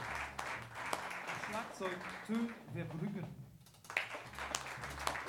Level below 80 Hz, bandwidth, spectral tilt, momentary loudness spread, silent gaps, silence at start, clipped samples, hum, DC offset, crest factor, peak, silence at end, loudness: -62 dBFS; 19 kHz; -4 dB/octave; 6 LU; none; 0 s; under 0.1%; none; under 0.1%; 30 dB; -14 dBFS; 0 s; -42 LUFS